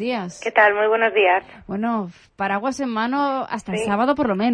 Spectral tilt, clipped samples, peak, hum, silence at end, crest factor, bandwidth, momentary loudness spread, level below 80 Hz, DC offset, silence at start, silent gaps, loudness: -5 dB/octave; under 0.1%; -4 dBFS; none; 0 s; 18 dB; 10.5 kHz; 10 LU; -56 dBFS; under 0.1%; 0 s; none; -20 LUFS